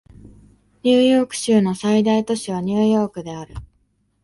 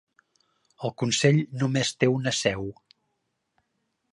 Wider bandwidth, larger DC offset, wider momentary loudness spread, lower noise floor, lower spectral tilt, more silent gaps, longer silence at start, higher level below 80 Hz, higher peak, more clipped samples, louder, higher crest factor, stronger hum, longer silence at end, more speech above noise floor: about the same, 11.5 kHz vs 11.5 kHz; neither; first, 17 LU vs 13 LU; second, -64 dBFS vs -77 dBFS; about the same, -5.5 dB/octave vs -4.5 dB/octave; neither; second, 0.25 s vs 0.8 s; first, -48 dBFS vs -60 dBFS; about the same, -4 dBFS vs -6 dBFS; neither; first, -18 LUFS vs -25 LUFS; second, 16 dB vs 22 dB; neither; second, 0.6 s vs 1.4 s; second, 46 dB vs 53 dB